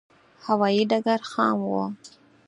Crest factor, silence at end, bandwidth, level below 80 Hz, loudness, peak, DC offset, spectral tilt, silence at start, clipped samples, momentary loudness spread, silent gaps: 18 dB; 0.4 s; 10.5 kHz; -74 dBFS; -24 LUFS; -8 dBFS; under 0.1%; -6 dB/octave; 0.45 s; under 0.1%; 13 LU; none